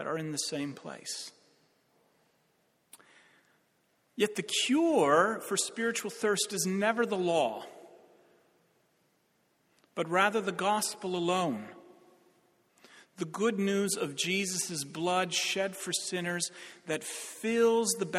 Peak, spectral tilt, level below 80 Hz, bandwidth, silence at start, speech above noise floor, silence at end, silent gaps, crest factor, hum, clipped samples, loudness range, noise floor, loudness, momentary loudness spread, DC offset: -12 dBFS; -3 dB/octave; -78 dBFS; 16 kHz; 0 s; 42 dB; 0 s; none; 20 dB; none; under 0.1%; 9 LU; -72 dBFS; -30 LUFS; 13 LU; under 0.1%